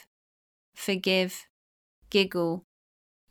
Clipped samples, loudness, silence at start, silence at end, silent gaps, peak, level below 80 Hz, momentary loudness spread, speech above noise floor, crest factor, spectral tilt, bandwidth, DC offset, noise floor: under 0.1%; -28 LUFS; 0.75 s; 0.7 s; 1.50-2.02 s; -10 dBFS; -68 dBFS; 12 LU; over 63 dB; 22 dB; -4.5 dB/octave; 19.5 kHz; under 0.1%; under -90 dBFS